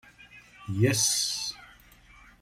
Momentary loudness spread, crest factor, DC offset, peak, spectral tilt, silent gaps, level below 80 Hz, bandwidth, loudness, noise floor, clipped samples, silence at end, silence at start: 21 LU; 18 dB; under 0.1%; -12 dBFS; -3 dB/octave; none; -60 dBFS; 16 kHz; -26 LUFS; -55 dBFS; under 0.1%; 0.75 s; 0.35 s